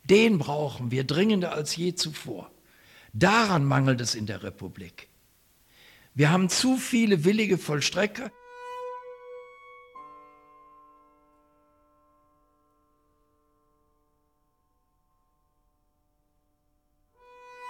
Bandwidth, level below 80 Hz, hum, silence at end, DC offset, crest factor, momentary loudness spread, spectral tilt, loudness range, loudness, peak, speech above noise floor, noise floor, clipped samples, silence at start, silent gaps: 16.5 kHz; -64 dBFS; none; 0 s; under 0.1%; 20 dB; 23 LU; -5 dB/octave; 13 LU; -25 LUFS; -8 dBFS; 47 dB; -72 dBFS; under 0.1%; 0.05 s; none